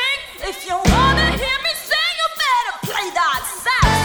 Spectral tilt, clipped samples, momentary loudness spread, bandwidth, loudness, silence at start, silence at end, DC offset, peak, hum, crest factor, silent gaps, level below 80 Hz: -3.5 dB/octave; under 0.1%; 8 LU; over 20 kHz; -18 LUFS; 0 s; 0 s; under 0.1%; 0 dBFS; none; 18 dB; none; -28 dBFS